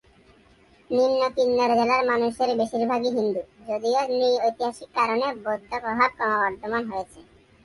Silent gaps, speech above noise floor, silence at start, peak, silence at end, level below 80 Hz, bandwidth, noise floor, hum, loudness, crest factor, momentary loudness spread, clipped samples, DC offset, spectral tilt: none; 33 dB; 0.9 s; -6 dBFS; 0.4 s; -60 dBFS; 11.5 kHz; -56 dBFS; none; -24 LUFS; 18 dB; 9 LU; under 0.1%; under 0.1%; -4.5 dB/octave